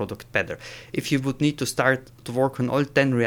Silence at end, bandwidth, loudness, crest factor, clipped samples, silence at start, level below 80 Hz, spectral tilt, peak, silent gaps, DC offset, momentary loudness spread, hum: 0 s; 19.5 kHz; -24 LUFS; 18 dB; under 0.1%; 0 s; -54 dBFS; -5.5 dB/octave; -6 dBFS; none; under 0.1%; 10 LU; none